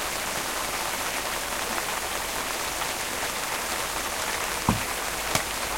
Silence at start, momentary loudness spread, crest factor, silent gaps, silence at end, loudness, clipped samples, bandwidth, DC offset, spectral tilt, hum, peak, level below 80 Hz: 0 s; 2 LU; 24 dB; none; 0 s; -27 LUFS; under 0.1%; 16.5 kHz; under 0.1%; -2 dB/octave; none; -4 dBFS; -46 dBFS